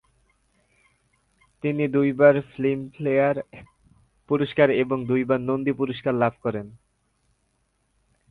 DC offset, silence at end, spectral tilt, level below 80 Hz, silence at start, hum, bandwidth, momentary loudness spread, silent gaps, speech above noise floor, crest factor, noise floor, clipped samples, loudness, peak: under 0.1%; 1.55 s; -9 dB/octave; -62 dBFS; 1.65 s; none; 4.5 kHz; 12 LU; none; 48 dB; 20 dB; -70 dBFS; under 0.1%; -23 LUFS; -6 dBFS